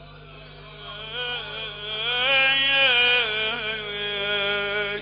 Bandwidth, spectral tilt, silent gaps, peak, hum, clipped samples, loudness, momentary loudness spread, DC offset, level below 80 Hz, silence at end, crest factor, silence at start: 5.2 kHz; 1.5 dB/octave; none; -8 dBFS; 50 Hz at -45 dBFS; under 0.1%; -21 LUFS; 15 LU; under 0.1%; -52 dBFS; 0 s; 16 dB; 0 s